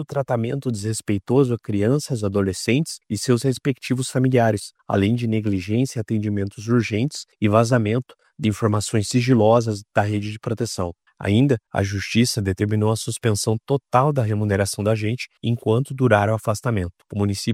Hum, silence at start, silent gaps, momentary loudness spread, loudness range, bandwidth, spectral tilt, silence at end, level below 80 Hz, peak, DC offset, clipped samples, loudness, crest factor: none; 0 s; none; 8 LU; 2 LU; 15 kHz; -6 dB/octave; 0 s; -54 dBFS; -2 dBFS; under 0.1%; under 0.1%; -21 LUFS; 20 dB